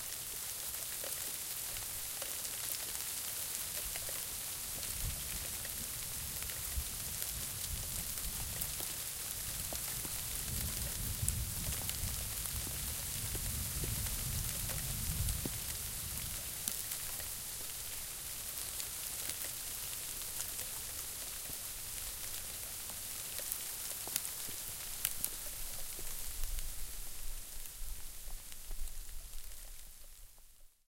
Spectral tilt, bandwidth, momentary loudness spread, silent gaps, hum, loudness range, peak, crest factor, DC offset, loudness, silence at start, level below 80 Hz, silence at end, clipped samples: -1.5 dB/octave; 17 kHz; 9 LU; none; none; 4 LU; -10 dBFS; 32 dB; under 0.1%; -39 LUFS; 0 s; -48 dBFS; 0.2 s; under 0.1%